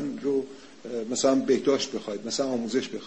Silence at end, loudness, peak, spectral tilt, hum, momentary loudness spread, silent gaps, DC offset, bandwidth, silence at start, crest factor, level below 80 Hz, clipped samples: 0 s; -27 LUFS; -10 dBFS; -3.5 dB/octave; none; 12 LU; none; 0.2%; 8.6 kHz; 0 s; 18 dB; -66 dBFS; under 0.1%